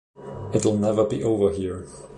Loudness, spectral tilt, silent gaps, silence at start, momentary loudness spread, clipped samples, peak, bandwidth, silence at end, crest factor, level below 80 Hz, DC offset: -23 LUFS; -6.5 dB/octave; none; 0.2 s; 15 LU; under 0.1%; -8 dBFS; 11 kHz; 0 s; 16 dB; -48 dBFS; under 0.1%